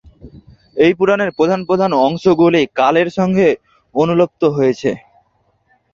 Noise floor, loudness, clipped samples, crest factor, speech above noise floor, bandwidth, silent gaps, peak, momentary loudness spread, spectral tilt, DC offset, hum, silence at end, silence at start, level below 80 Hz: -60 dBFS; -14 LUFS; under 0.1%; 14 dB; 47 dB; 7.4 kHz; none; -2 dBFS; 9 LU; -7 dB/octave; under 0.1%; none; 0.95 s; 0.25 s; -50 dBFS